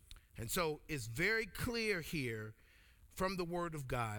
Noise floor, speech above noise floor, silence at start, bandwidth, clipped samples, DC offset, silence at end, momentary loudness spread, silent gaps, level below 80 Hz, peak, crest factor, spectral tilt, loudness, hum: -64 dBFS; 25 dB; 0.1 s; over 20 kHz; under 0.1%; under 0.1%; 0 s; 13 LU; none; -56 dBFS; -24 dBFS; 18 dB; -4.5 dB/octave; -39 LUFS; none